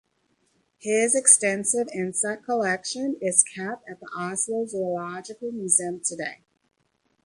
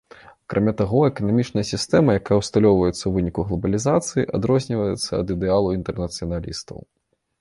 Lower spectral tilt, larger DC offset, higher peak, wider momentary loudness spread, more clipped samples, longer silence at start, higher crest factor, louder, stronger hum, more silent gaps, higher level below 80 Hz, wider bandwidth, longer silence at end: second, -2.5 dB/octave vs -6 dB/octave; neither; first, 0 dBFS vs -4 dBFS; first, 17 LU vs 10 LU; neither; first, 0.85 s vs 0.5 s; first, 26 dB vs 18 dB; about the same, -23 LUFS vs -21 LUFS; neither; neither; second, -72 dBFS vs -42 dBFS; about the same, 11.5 kHz vs 11.5 kHz; first, 0.9 s vs 0.65 s